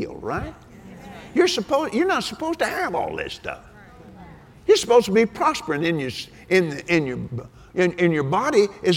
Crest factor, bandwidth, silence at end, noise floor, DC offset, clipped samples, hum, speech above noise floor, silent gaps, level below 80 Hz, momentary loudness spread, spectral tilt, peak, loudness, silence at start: 18 dB; 17 kHz; 0 s; -45 dBFS; under 0.1%; under 0.1%; none; 24 dB; none; -50 dBFS; 15 LU; -5 dB/octave; -4 dBFS; -22 LUFS; 0 s